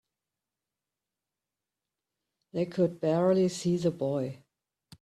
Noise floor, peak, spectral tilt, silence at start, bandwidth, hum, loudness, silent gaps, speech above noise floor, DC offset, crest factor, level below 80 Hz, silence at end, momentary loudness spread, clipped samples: -90 dBFS; -14 dBFS; -7 dB/octave; 2.55 s; 12.5 kHz; none; -29 LUFS; none; 62 dB; under 0.1%; 18 dB; -70 dBFS; 0.65 s; 9 LU; under 0.1%